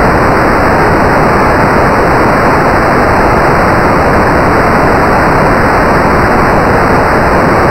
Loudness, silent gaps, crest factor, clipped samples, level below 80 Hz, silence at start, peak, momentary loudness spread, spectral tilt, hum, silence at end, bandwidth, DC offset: -7 LUFS; none; 6 dB; 0.3%; -20 dBFS; 0 s; 0 dBFS; 0 LU; -6.5 dB/octave; none; 0 s; 16.5 kHz; under 0.1%